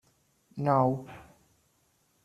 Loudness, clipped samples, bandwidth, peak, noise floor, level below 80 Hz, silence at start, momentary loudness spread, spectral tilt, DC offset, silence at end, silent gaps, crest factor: -28 LUFS; under 0.1%; 12.5 kHz; -10 dBFS; -70 dBFS; -68 dBFS; 0.55 s; 23 LU; -9.5 dB/octave; under 0.1%; 1 s; none; 22 dB